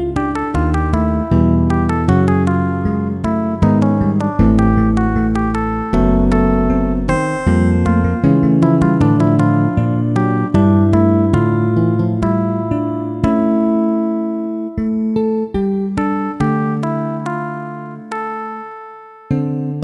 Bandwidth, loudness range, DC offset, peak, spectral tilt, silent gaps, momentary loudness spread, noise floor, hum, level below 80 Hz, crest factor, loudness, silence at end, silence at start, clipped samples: 10.5 kHz; 6 LU; under 0.1%; 0 dBFS; -9 dB/octave; none; 9 LU; -36 dBFS; none; -26 dBFS; 14 dB; -15 LUFS; 0 s; 0 s; under 0.1%